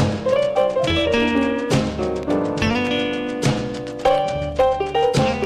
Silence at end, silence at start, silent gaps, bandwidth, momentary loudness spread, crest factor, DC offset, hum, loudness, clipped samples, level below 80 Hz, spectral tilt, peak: 0 s; 0 s; none; 14.5 kHz; 5 LU; 14 dB; under 0.1%; none; -20 LUFS; under 0.1%; -38 dBFS; -5.5 dB/octave; -6 dBFS